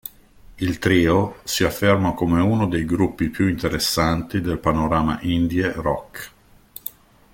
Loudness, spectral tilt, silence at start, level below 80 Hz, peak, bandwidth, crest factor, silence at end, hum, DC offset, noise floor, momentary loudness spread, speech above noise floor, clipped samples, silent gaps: -21 LUFS; -5.5 dB/octave; 0.05 s; -40 dBFS; -4 dBFS; 17 kHz; 18 dB; 0.45 s; none; under 0.1%; -47 dBFS; 16 LU; 27 dB; under 0.1%; none